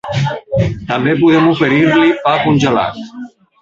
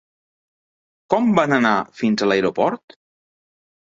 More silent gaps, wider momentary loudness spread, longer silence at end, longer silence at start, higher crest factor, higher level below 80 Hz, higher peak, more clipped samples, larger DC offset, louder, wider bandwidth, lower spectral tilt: neither; first, 11 LU vs 6 LU; second, 0.35 s vs 1.2 s; second, 0.05 s vs 1.1 s; second, 12 dB vs 20 dB; first, -40 dBFS vs -62 dBFS; about the same, 0 dBFS vs -2 dBFS; neither; neither; first, -13 LUFS vs -19 LUFS; about the same, 7.6 kHz vs 7.6 kHz; about the same, -6.5 dB/octave vs -6 dB/octave